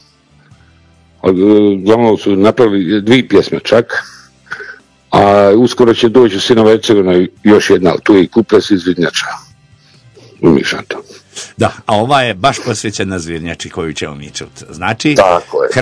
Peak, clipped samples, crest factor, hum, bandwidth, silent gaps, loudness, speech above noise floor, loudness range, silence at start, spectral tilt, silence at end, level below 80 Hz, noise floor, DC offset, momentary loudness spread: 0 dBFS; 2%; 12 dB; none; 11 kHz; none; -11 LUFS; 37 dB; 7 LU; 1.25 s; -5.5 dB/octave; 0 s; -44 dBFS; -47 dBFS; under 0.1%; 17 LU